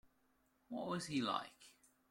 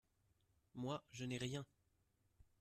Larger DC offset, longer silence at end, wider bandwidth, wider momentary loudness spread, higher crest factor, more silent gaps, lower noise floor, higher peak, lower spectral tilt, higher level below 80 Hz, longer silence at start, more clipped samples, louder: neither; first, 0.4 s vs 0.15 s; first, 16.5 kHz vs 14 kHz; first, 16 LU vs 13 LU; about the same, 22 dB vs 20 dB; neither; about the same, -78 dBFS vs -81 dBFS; first, -24 dBFS vs -32 dBFS; about the same, -4.5 dB/octave vs -5 dB/octave; about the same, -80 dBFS vs -76 dBFS; about the same, 0.7 s vs 0.75 s; neither; first, -42 LUFS vs -48 LUFS